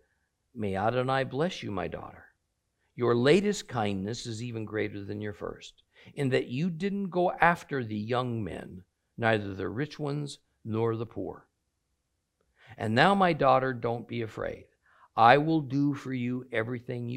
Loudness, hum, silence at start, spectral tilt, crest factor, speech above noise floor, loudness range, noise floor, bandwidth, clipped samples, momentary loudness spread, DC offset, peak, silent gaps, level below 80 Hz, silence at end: -29 LUFS; none; 0.55 s; -6 dB/octave; 26 dB; 50 dB; 7 LU; -79 dBFS; 13.5 kHz; under 0.1%; 16 LU; under 0.1%; -4 dBFS; none; -62 dBFS; 0 s